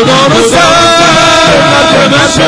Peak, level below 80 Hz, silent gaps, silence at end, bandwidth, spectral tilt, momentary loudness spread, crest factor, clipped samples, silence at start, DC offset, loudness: 0 dBFS; -30 dBFS; none; 0 s; 11 kHz; -3.5 dB/octave; 1 LU; 4 dB; 3%; 0 s; under 0.1%; -4 LUFS